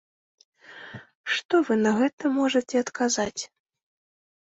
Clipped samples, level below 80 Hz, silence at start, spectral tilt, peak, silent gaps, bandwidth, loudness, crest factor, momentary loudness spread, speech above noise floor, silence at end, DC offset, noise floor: under 0.1%; -66 dBFS; 0.7 s; -3.5 dB/octave; -10 dBFS; 1.15-1.24 s, 1.45-1.49 s, 2.13-2.18 s; 8.2 kHz; -24 LUFS; 16 dB; 20 LU; 20 dB; 0.95 s; under 0.1%; -44 dBFS